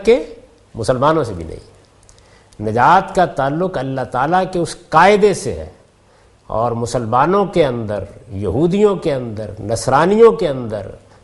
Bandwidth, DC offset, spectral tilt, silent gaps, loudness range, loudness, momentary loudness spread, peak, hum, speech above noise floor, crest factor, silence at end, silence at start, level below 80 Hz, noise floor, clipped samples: 11.5 kHz; under 0.1%; -6 dB/octave; none; 3 LU; -16 LUFS; 16 LU; 0 dBFS; none; 35 dB; 16 dB; 0.25 s; 0 s; -42 dBFS; -50 dBFS; under 0.1%